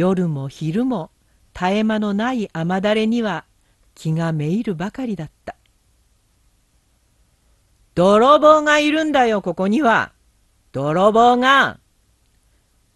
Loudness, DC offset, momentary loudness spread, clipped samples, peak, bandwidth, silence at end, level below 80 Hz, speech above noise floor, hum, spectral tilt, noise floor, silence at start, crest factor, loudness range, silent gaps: -17 LUFS; under 0.1%; 17 LU; under 0.1%; 0 dBFS; 12.5 kHz; 1.2 s; -52 dBFS; 44 dB; none; -6 dB/octave; -60 dBFS; 0 s; 18 dB; 11 LU; none